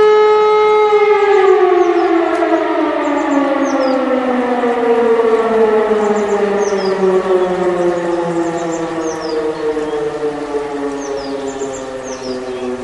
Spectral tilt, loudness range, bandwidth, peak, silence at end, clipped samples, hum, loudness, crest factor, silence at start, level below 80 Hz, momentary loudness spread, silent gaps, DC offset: -5 dB/octave; 8 LU; 11 kHz; 0 dBFS; 0 s; under 0.1%; none; -14 LUFS; 14 dB; 0 s; -50 dBFS; 11 LU; none; under 0.1%